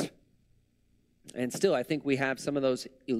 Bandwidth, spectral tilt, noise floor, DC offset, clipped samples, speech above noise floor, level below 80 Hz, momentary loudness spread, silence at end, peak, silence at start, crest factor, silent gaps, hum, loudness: 15.5 kHz; -5 dB/octave; -69 dBFS; under 0.1%; under 0.1%; 40 dB; -68 dBFS; 9 LU; 0 s; -12 dBFS; 0 s; 20 dB; none; 60 Hz at -65 dBFS; -30 LUFS